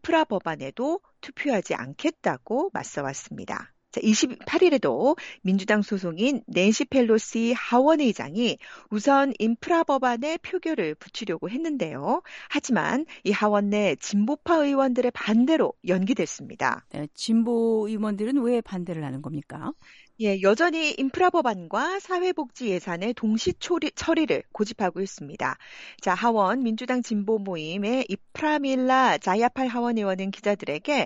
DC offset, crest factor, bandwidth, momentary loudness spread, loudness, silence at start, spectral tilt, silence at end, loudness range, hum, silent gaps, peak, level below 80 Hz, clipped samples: under 0.1%; 16 dB; 10.5 kHz; 11 LU; -25 LUFS; 0.05 s; -5 dB/octave; 0 s; 4 LU; none; none; -8 dBFS; -64 dBFS; under 0.1%